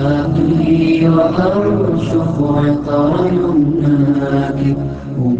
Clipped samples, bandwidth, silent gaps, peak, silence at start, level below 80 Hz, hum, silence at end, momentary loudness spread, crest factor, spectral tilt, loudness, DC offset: under 0.1%; 7.8 kHz; none; 0 dBFS; 0 s; -36 dBFS; none; 0 s; 5 LU; 12 dB; -9 dB/octave; -14 LUFS; under 0.1%